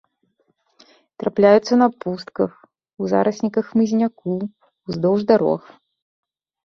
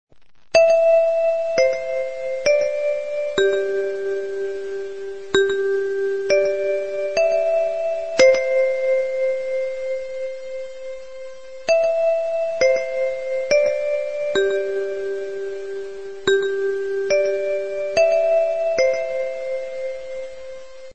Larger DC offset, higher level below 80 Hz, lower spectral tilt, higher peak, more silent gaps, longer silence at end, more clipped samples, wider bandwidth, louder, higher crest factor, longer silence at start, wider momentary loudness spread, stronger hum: second, under 0.1% vs 1%; second, -62 dBFS vs -56 dBFS; first, -7 dB/octave vs -3 dB/octave; about the same, -2 dBFS vs -2 dBFS; neither; first, 1.05 s vs 0 s; neither; second, 6.8 kHz vs 8.6 kHz; about the same, -19 LUFS vs -21 LUFS; about the same, 18 dB vs 18 dB; first, 1.2 s vs 0.05 s; about the same, 14 LU vs 14 LU; neither